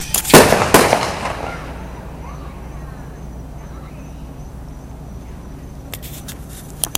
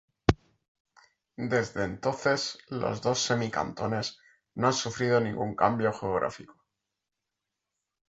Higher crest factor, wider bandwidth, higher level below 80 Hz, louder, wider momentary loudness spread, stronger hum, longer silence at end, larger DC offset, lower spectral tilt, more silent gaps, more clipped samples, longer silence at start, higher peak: second, 20 dB vs 28 dB; first, 17 kHz vs 8 kHz; first, -34 dBFS vs -52 dBFS; first, -13 LUFS vs -29 LUFS; first, 24 LU vs 8 LU; neither; second, 0 s vs 1.6 s; neither; about the same, -3.5 dB/octave vs -4.5 dB/octave; second, none vs 0.68-0.85 s; first, 0.2% vs under 0.1%; second, 0 s vs 0.3 s; about the same, 0 dBFS vs -2 dBFS